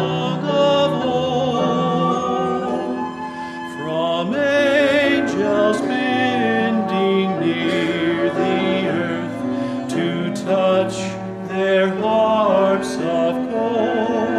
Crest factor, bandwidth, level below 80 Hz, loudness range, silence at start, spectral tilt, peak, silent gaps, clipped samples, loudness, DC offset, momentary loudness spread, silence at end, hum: 14 dB; 12.5 kHz; -58 dBFS; 3 LU; 0 s; -6 dB/octave; -4 dBFS; none; under 0.1%; -19 LUFS; under 0.1%; 8 LU; 0 s; none